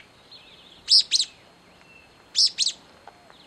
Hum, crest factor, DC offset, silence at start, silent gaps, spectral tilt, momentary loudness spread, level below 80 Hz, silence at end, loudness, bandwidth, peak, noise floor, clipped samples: none; 22 dB; under 0.1%; 0.35 s; none; 2.5 dB/octave; 19 LU; -70 dBFS; 0.75 s; -20 LUFS; 15.5 kHz; -4 dBFS; -53 dBFS; under 0.1%